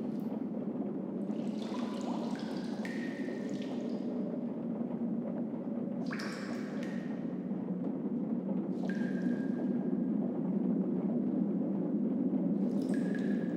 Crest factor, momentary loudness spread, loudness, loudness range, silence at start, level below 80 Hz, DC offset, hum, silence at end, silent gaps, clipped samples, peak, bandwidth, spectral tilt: 14 dB; 5 LU; -35 LUFS; 4 LU; 0 s; -78 dBFS; under 0.1%; none; 0 s; none; under 0.1%; -20 dBFS; 9.8 kHz; -8 dB/octave